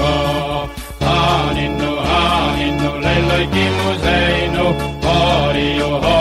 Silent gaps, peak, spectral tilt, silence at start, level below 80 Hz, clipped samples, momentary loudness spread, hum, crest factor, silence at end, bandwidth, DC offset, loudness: none; -4 dBFS; -5.5 dB/octave; 0 s; -26 dBFS; under 0.1%; 5 LU; none; 12 dB; 0 s; 14 kHz; under 0.1%; -16 LUFS